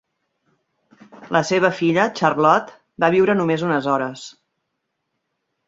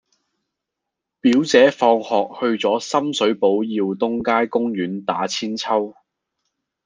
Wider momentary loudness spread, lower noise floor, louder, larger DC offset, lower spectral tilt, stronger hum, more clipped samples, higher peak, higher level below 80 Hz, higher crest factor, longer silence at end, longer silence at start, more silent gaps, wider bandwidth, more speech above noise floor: about the same, 11 LU vs 9 LU; second, -76 dBFS vs -82 dBFS; about the same, -18 LUFS vs -19 LUFS; neither; about the same, -5.5 dB/octave vs -4.5 dB/octave; neither; neither; about the same, -2 dBFS vs -2 dBFS; about the same, -64 dBFS vs -66 dBFS; about the same, 20 dB vs 18 dB; first, 1.4 s vs 0.95 s; about the same, 1.15 s vs 1.25 s; neither; second, 7.8 kHz vs 9.8 kHz; second, 58 dB vs 64 dB